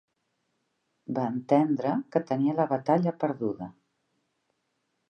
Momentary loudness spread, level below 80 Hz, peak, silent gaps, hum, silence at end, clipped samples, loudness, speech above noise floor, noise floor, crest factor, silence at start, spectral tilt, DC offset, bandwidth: 11 LU; -76 dBFS; -10 dBFS; none; none; 1.4 s; under 0.1%; -27 LUFS; 51 dB; -77 dBFS; 20 dB; 1.1 s; -9.5 dB/octave; under 0.1%; 6.6 kHz